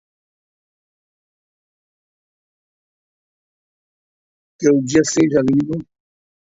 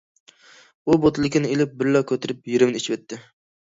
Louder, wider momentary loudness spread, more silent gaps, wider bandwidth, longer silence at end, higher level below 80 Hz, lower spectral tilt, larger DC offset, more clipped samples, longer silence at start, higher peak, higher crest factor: first, -16 LUFS vs -21 LUFS; second, 8 LU vs 12 LU; neither; about the same, 8 kHz vs 7.8 kHz; first, 0.65 s vs 0.4 s; about the same, -56 dBFS vs -54 dBFS; about the same, -5.5 dB/octave vs -6 dB/octave; neither; neither; first, 4.6 s vs 0.85 s; about the same, -2 dBFS vs -4 dBFS; about the same, 20 dB vs 18 dB